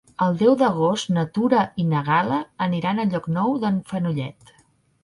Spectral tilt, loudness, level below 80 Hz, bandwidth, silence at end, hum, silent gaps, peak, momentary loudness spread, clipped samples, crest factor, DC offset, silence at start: -7 dB/octave; -22 LUFS; -60 dBFS; 11.5 kHz; 0.7 s; none; none; -4 dBFS; 7 LU; under 0.1%; 16 dB; under 0.1%; 0.2 s